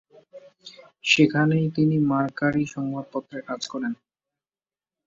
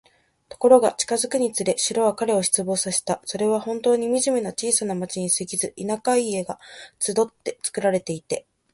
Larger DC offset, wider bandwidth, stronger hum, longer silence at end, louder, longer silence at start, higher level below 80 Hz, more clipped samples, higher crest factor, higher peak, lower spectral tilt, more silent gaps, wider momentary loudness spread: neither; second, 7.6 kHz vs 12 kHz; neither; first, 1.15 s vs 0.35 s; about the same, -23 LUFS vs -22 LUFS; second, 0.35 s vs 0.5 s; about the same, -64 dBFS vs -64 dBFS; neither; about the same, 20 dB vs 20 dB; second, -6 dBFS vs -2 dBFS; first, -5.5 dB/octave vs -3.5 dB/octave; neither; first, 14 LU vs 9 LU